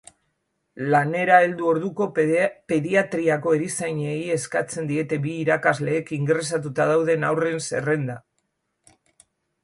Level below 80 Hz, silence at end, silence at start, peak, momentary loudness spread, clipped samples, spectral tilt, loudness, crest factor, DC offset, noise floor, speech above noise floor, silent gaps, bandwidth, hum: -66 dBFS; 1.45 s; 0.75 s; -4 dBFS; 7 LU; under 0.1%; -5.5 dB/octave; -22 LUFS; 20 dB; under 0.1%; -74 dBFS; 52 dB; none; 11.5 kHz; none